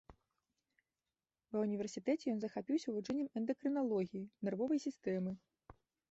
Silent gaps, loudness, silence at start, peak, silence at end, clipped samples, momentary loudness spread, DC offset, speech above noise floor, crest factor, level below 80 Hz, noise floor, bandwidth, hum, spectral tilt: none; -40 LUFS; 0.1 s; -24 dBFS; 0.4 s; under 0.1%; 6 LU; under 0.1%; over 51 dB; 16 dB; -76 dBFS; under -90 dBFS; 8 kHz; none; -7 dB/octave